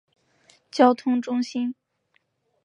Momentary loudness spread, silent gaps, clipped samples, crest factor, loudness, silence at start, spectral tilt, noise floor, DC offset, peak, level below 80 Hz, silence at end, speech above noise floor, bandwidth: 14 LU; none; under 0.1%; 22 dB; -23 LUFS; 0.75 s; -4.5 dB/octave; -70 dBFS; under 0.1%; -4 dBFS; -84 dBFS; 0.9 s; 49 dB; 8.4 kHz